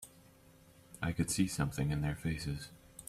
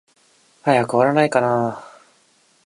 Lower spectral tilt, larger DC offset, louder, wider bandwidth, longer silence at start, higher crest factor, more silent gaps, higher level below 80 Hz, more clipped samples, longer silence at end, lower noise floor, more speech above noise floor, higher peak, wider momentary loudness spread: second, -5 dB/octave vs -6.5 dB/octave; neither; second, -36 LUFS vs -18 LUFS; first, 15 kHz vs 11.5 kHz; second, 0 s vs 0.65 s; about the same, 20 dB vs 20 dB; neither; first, -52 dBFS vs -66 dBFS; neither; second, 0 s vs 0.8 s; first, -62 dBFS vs -58 dBFS; second, 26 dB vs 41 dB; second, -18 dBFS vs -2 dBFS; first, 16 LU vs 10 LU